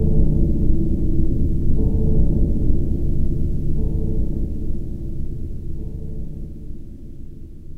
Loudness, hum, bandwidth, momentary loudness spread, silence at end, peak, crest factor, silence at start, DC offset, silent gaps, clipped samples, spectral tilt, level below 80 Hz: -24 LUFS; none; 0.9 kHz; 17 LU; 0 s; -2 dBFS; 16 dB; 0 s; under 0.1%; none; under 0.1%; -11.5 dB/octave; -20 dBFS